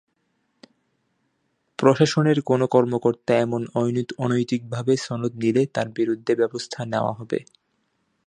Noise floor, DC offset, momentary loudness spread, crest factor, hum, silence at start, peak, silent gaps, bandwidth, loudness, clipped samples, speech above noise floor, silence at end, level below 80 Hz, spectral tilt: -72 dBFS; under 0.1%; 9 LU; 22 dB; none; 1.8 s; -2 dBFS; none; 10 kHz; -22 LUFS; under 0.1%; 50 dB; 0.85 s; -64 dBFS; -6.5 dB/octave